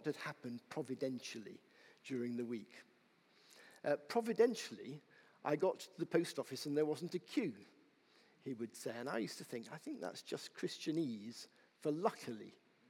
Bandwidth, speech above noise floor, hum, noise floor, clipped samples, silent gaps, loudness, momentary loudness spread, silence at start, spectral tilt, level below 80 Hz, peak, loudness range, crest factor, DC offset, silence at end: 17 kHz; 31 dB; none; -72 dBFS; under 0.1%; none; -42 LUFS; 17 LU; 0 s; -5 dB/octave; under -90 dBFS; -20 dBFS; 7 LU; 22 dB; under 0.1%; 0.4 s